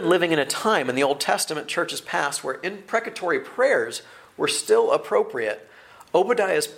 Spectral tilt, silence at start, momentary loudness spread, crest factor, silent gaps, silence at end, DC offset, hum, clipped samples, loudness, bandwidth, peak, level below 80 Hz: -3 dB/octave; 0 s; 8 LU; 18 dB; none; 0 s; under 0.1%; none; under 0.1%; -23 LUFS; 16.5 kHz; -6 dBFS; -72 dBFS